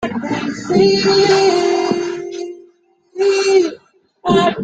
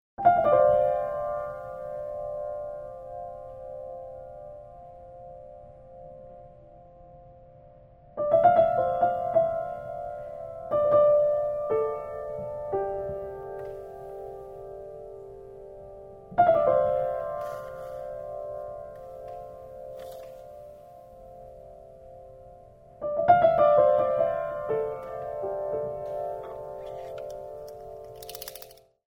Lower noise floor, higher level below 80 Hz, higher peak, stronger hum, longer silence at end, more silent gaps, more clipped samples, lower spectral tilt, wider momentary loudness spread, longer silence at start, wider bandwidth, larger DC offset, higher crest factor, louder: about the same, -53 dBFS vs -52 dBFS; about the same, -52 dBFS vs -56 dBFS; first, -2 dBFS vs -6 dBFS; neither; second, 0 s vs 0.4 s; neither; neither; second, -4.5 dB/octave vs -6.5 dB/octave; second, 14 LU vs 26 LU; second, 0 s vs 0.2 s; second, 9 kHz vs 16 kHz; neither; second, 14 dB vs 22 dB; first, -15 LUFS vs -26 LUFS